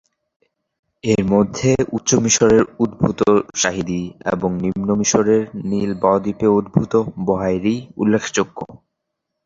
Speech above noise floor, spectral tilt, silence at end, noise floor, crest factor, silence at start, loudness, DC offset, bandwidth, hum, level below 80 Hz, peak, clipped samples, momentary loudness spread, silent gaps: 60 dB; -5 dB/octave; 0.7 s; -78 dBFS; 16 dB; 1.05 s; -18 LUFS; under 0.1%; 7.8 kHz; none; -46 dBFS; -2 dBFS; under 0.1%; 8 LU; none